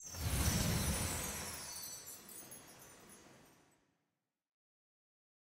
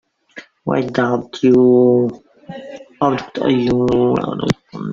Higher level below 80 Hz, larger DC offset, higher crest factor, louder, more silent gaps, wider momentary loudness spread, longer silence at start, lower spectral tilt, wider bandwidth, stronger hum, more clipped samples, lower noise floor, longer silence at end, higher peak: about the same, -52 dBFS vs -48 dBFS; neither; first, 22 dB vs 16 dB; second, -39 LUFS vs -16 LUFS; neither; about the same, 22 LU vs 21 LU; second, 0 s vs 0.35 s; second, -3.5 dB/octave vs -7.5 dB/octave; first, 16 kHz vs 7.4 kHz; neither; neither; first, -89 dBFS vs -40 dBFS; first, 2.1 s vs 0 s; second, -22 dBFS vs 0 dBFS